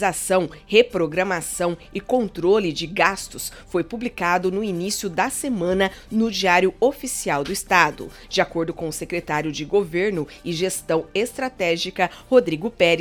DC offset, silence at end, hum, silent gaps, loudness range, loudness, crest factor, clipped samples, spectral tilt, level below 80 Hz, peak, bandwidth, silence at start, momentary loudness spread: under 0.1%; 0 s; none; none; 3 LU; -22 LUFS; 22 dB; under 0.1%; -4 dB/octave; -48 dBFS; 0 dBFS; 18 kHz; 0 s; 9 LU